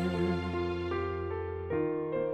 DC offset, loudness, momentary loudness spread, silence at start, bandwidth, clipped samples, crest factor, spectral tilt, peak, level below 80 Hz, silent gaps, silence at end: under 0.1%; -33 LUFS; 4 LU; 0 s; 9 kHz; under 0.1%; 14 dB; -8 dB/octave; -18 dBFS; -56 dBFS; none; 0 s